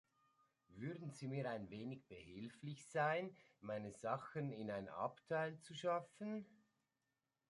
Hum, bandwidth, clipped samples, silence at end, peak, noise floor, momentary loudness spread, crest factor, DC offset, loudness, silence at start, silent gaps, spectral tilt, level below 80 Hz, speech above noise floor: none; 11.5 kHz; under 0.1%; 0.95 s; -28 dBFS; under -90 dBFS; 13 LU; 20 dB; under 0.1%; -47 LUFS; 0.7 s; none; -6 dB/octave; -82 dBFS; over 44 dB